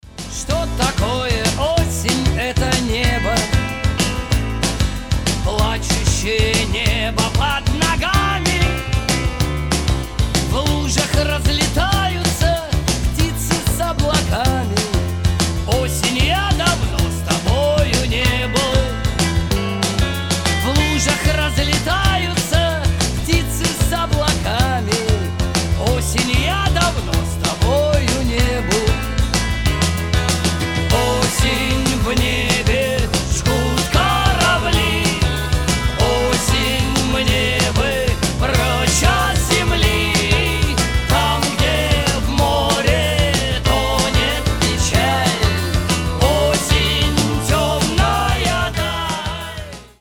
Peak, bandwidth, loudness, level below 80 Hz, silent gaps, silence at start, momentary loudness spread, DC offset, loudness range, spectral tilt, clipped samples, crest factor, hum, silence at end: 0 dBFS; 20 kHz; -17 LUFS; -22 dBFS; none; 0.05 s; 4 LU; 0.4%; 2 LU; -4 dB/octave; under 0.1%; 16 dB; none; 0.15 s